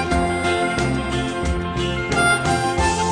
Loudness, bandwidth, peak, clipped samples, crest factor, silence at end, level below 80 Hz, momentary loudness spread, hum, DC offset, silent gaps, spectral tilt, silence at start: -20 LUFS; 10 kHz; -4 dBFS; under 0.1%; 16 dB; 0 s; -30 dBFS; 6 LU; none; under 0.1%; none; -4.5 dB/octave; 0 s